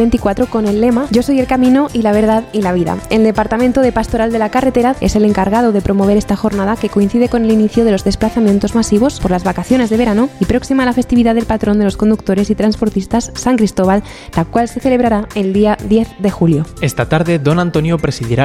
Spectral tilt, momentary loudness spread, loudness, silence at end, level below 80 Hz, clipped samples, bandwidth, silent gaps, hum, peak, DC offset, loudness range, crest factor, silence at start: -6.5 dB/octave; 4 LU; -13 LUFS; 0 s; -30 dBFS; under 0.1%; 14.5 kHz; none; none; 0 dBFS; under 0.1%; 2 LU; 12 dB; 0 s